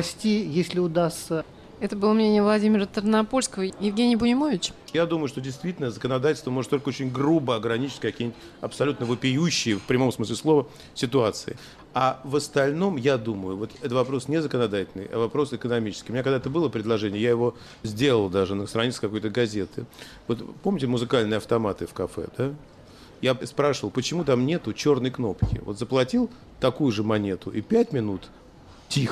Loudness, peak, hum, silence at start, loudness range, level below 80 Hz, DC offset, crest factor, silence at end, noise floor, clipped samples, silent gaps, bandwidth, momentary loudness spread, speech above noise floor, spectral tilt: -25 LUFS; -10 dBFS; none; 0 s; 4 LU; -50 dBFS; under 0.1%; 16 dB; 0 s; -44 dBFS; under 0.1%; none; 13.5 kHz; 9 LU; 19 dB; -5.5 dB/octave